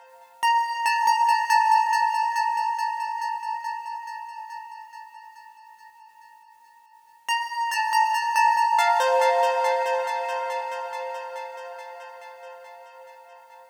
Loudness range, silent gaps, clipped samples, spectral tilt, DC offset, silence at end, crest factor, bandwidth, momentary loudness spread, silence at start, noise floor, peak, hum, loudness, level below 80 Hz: 14 LU; none; under 0.1%; 2.5 dB/octave; under 0.1%; 0.05 s; 16 dB; 19.5 kHz; 21 LU; 0.15 s; -54 dBFS; -10 dBFS; none; -23 LUFS; -84 dBFS